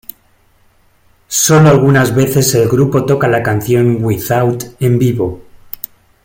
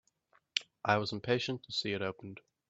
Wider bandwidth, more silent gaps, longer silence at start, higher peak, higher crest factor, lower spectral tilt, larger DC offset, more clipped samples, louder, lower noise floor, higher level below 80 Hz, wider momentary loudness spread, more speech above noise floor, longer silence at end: first, 17 kHz vs 8.2 kHz; neither; first, 1.3 s vs 0.55 s; first, 0 dBFS vs -10 dBFS; second, 12 dB vs 26 dB; about the same, -5.5 dB/octave vs -4.5 dB/octave; neither; neither; first, -11 LUFS vs -35 LUFS; second, -52 dBFS vs -72 dBFS; first, -44 dBFS vs -74 dBFS; first, 18 LU vs 8 LU; about the same, 41 dB vs 38 dB; first, 0.85 s vs 0.3 s